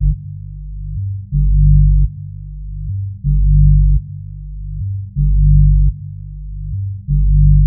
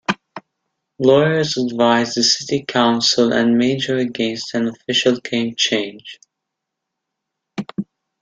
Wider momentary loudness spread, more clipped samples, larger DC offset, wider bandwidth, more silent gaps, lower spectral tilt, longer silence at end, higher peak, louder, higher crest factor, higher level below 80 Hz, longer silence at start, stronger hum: first, 18 LU vs 15 LU; neither; neither; second, 0.4 kHz vs 9.2 kHz; neither; first, -25 dB/octave vs -4 dB/octave; second, 0 s vs 0.4 s; about the same, -2 dBFS vs 0 dBFS; about the same, -16 LUFS vs -17 LUFS; second, 12 dB vs 18 dB; first, -14 dBFS vs -60 dBFS; about the same, 0 s vs 0.1 s; first, 50 Hz at -20 dBFS vs none